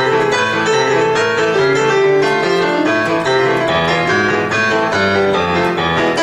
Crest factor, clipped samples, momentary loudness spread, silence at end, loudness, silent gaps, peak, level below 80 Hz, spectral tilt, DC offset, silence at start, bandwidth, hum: 12 dB; under 0.1%; 2 LU; 0 s; -14 LUFS; none; -2 dBFS; -46 dBFS; -4.5 dB/octave; under 0.1%; 0 s; 12 kHz; none